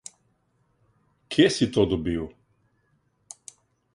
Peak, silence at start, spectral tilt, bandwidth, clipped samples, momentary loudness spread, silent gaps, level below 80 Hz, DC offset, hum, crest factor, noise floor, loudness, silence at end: -4 dBFS; 1.3 s; -5 dB/octave; 11.5 kHz; under 0.1%; 25 LU; none; -50 dBFS; under 0.1%; none; 24 dB; -69 dBFS; -23 LUFS; 1.65 s